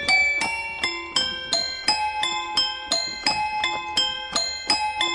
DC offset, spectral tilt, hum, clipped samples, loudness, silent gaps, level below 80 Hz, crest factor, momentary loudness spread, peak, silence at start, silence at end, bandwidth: under 0.1%; 0 dB/octave; none; under 0.1%; -22 LUFS; none; -54 dBFS; 18 dB; 4 LU; -6 dBFS; 0 s; 0 s; 11.5 kHz